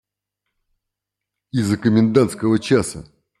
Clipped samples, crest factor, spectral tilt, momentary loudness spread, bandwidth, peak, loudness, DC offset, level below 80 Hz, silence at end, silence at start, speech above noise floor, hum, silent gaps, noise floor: under 0.1%; 18 dB; -6.5 dB/octave; 12 LU; 13 kHz; -2 dBFS; -18 LUFS; under 0.1%; -54 dBFS; 0.4 s; 1.55 s; 66 dB; 50 Hz at -45 dBFS; none; -83 dBFS